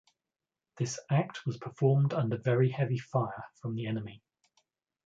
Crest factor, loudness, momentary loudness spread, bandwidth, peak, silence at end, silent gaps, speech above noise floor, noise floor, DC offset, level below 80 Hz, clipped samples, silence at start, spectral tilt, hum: 18 dB; -32 LUFS; 11 LU; 7.8 kHz; -14 dBFS; 0.9 s; none; over 60 dB; under -90 dBFS; under 0.1%; -70 dBFS; under 0.1%; 0.75 s; -7 dB/octave; none